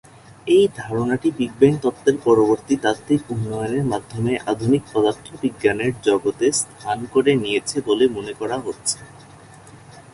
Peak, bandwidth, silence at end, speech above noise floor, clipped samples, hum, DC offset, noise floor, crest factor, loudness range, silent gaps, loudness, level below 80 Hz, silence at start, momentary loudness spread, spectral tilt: -2 dBFS; 11.5 kHz; 0.15 s; 24 dB; under 0.1%; none; under 0.1%; -44 dBFS; 18 dB; 3 LU; none; -20 LUFS; -52 dBFS; 0.45 s; 9 LU; -5 dB/octave